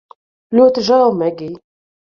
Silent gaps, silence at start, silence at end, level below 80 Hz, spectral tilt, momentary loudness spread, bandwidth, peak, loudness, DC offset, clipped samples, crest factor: none; 0.5 s; 0.6 s; -60 dBFS; -6 dB/octave; 16 LU; 7 kHz; -2 dBFS; -13 LUFS; under 0.1%; under 0.1%; 14 dB